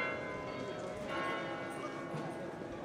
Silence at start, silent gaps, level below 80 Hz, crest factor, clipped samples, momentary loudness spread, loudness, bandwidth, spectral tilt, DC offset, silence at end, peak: 0 s; none; -66 dBFS; 14 dB; under 0.1%; 5 LU; -41 LUFS; 15.5 kHz; -5.5 dB/octave; under 0.1%; 0 s; -26 dBFS